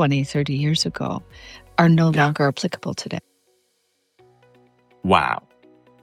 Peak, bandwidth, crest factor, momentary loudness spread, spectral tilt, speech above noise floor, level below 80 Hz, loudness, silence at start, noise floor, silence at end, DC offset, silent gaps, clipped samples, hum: -2 dBFS; 11 kHz; 20 dB; 16 LU; -6 dB/octave; 49 dB; -54 dBFS; -21 LUFS; 0 s; -69 dBFS; 0.65 s; under 0.1%; none; under 0.1%; none